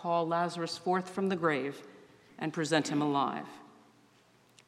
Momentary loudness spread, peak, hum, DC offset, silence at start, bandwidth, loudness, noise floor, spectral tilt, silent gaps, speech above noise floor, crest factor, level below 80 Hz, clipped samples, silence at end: 12 LU; -12 dBFS; none; under 0.1%; 0 s; 13.5 kHz; -32 LUFS; -64 dBFS; -5 dB/octave; none; 33 dB; 22 dB; -82 dBFS; under 0.1%; 1 s